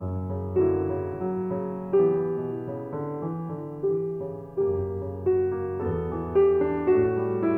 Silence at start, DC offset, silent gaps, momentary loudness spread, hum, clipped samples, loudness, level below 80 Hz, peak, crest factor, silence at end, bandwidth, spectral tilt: 0 s; under 0.1%; none; 10 LU; none; under 0.1%; -27 LUFS; -52 dBFS; -12 dBFS; 14 dB; 0 s; 3 kHz; -11.5 dB/octave